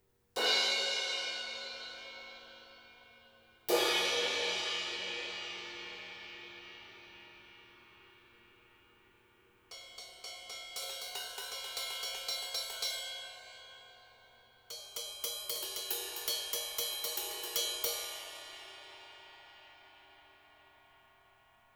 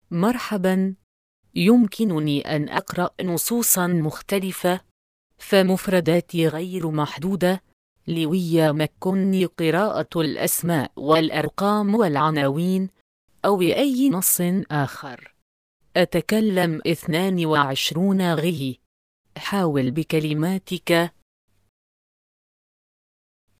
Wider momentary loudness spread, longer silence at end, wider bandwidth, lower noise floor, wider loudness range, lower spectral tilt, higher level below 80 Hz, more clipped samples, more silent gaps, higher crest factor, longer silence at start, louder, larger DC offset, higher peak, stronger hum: first, 23 LU vs 8 LU; second, 1 s vs 2.5 s; first, over 20 kHz vs 15.5 kHz; second, -67 dBFS vs under -90 dBFS; first, 18 LU vs 3 LU; second, 0.5 dB/octave vs -5 dB/octave; second, -76 dBFS vs -58 dBFS; neither; second, none vs 1.03-1.43 s, 4.91-5.30 s, 7.73-7.96 s, 13.01-13.28 s, 15.42-15.80 s, 18.86-19.24 s; first, 24 dB vs 18 dB; first, 0.35 s vs 0.1 s; second, -35 LUFS vs -22 LUFS; neither; second, -16 dBFS vs -4 dBFS; neither